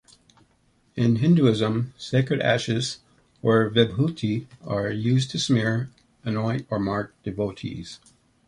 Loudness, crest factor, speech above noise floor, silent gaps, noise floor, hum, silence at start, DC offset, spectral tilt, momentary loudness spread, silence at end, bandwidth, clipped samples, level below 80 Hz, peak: -24 LUFS; 20 dB; 41 dB; none; -64 dBFS; none; 0.95 s; under 0.1%; -6 dB/octave; 15 LU; 0.5 s; 11 kHz; under 0.1%; -54 dBFS; -4 dBFS